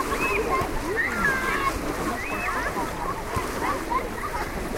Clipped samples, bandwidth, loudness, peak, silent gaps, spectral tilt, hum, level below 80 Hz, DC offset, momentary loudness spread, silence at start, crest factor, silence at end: under 0.1%; 16 kHz; -26 LUFS; -12 dBFS; none; -4 dB/octave; none; -38 dBFS; under 0.1%; 7 LU; 0 s; 14 dB; 0 s